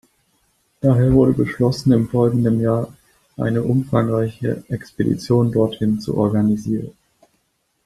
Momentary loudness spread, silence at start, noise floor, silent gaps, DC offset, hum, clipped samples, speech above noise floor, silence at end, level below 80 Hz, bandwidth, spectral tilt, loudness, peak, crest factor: 10 LU; 0.85 s; -68 dBFS; none; under 0.1%; none; under 0.1%; 50 dB; 0.95 s; -44 dBFS; 13 kHz; -8.5 dB/octave; -19 LUFS; -2 dBFS; 16 dB